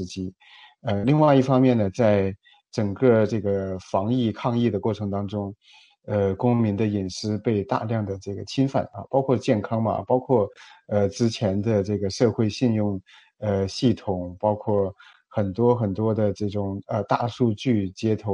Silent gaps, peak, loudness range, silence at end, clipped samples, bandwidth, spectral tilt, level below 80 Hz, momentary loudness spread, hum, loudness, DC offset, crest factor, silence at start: none; -4 dBFS; 4 LU; 0 s; under 0.1%; 10 kHz; -7.5 dB/octave; -58 dBFS; 10 LU; none; -24 LUFS; under 0.1%; 18 dB; 0 s